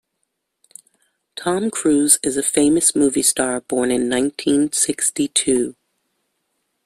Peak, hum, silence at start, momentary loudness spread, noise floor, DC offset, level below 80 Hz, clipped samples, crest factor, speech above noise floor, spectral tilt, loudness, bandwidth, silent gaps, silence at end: 0 dBFS; none; 1.35 s; 7 LU; -74 dBFS; under 0.1%; -56 dBFS; under 0.1%; 20 dB; 56 dB; -2.5 dB/octave; -17 LUFS; 15.5 kHz; none; 1.15 s